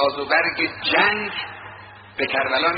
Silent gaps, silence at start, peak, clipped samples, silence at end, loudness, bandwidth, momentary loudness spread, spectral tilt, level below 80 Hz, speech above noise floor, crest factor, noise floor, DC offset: none; 0 s; -2 dBFS; under 0.1%; 0 s; -20 LUFS; 5.2 kHz; 19 LU; 0 dB/octave; -58 dBFS; 20 dB; 20 dB; -41 dBFS; under 0.1%